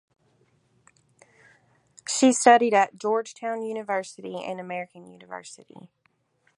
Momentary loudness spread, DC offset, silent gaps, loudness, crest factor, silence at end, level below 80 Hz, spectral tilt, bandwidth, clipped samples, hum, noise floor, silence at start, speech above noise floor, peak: 23 LU; under 0.1%; none; -23 LUFS; 24 dB; 1.05 s; -82 dBFS; -3 dB/octave; 11.5 kHz; under 0.1%; none; -69 dBFS; 2.05 s; 45 dB; -2 dBFS